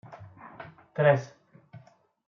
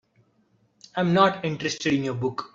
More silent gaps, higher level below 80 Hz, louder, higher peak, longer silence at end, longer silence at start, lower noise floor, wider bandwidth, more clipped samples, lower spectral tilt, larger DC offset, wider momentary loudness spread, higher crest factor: neither; second, -72 dBFS vs -62 dBFS; about the same, -26 LUFS vs -24 LUFS; second, -8 dBFS vs -4 dBFS; first, 0.5 s vs 0.05 s; second, 0.1 s vs 0.95 s; second, -55 dBFS vs -65 dBFS; second, 7 kHz vs 7.8 kHz; neither; about the same, -6 dB/octave vs -5.5 dB/octave; neither; first, 25 LU vs 9 LU; about the same, 22 dB vs 22 dB